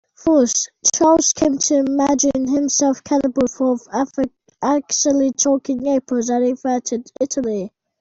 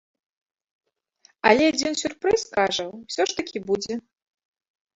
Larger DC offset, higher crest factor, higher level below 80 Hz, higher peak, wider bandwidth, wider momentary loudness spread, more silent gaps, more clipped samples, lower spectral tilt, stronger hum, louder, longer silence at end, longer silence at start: neither; second, 16 dB vs 24 dB; first, -52 dBFS vs -60 dBFS; about the same, -2 dBFS vs -2 dBFS; about the same, 8 kHz vs 8.2 kHz; second, 8 LU vs 12 LU; neither; neither; about the same, -3 dB/octave vs -3 dB/octave; neither; first, -18 LUFS vs -23 LUFS; second, 0.3 s vs 0.95 s; second, 0.25 s vs 1.45 s